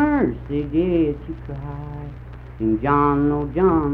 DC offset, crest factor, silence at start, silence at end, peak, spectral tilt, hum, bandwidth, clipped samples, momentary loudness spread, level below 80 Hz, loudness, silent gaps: under 0.1%; 16 dB; 0 s; 0 s; -4 dBFS; -11 dB/octave; none; 4.2 kHz; under 0.1%; 16 LU; -36 dBFS; -21 LUFS; none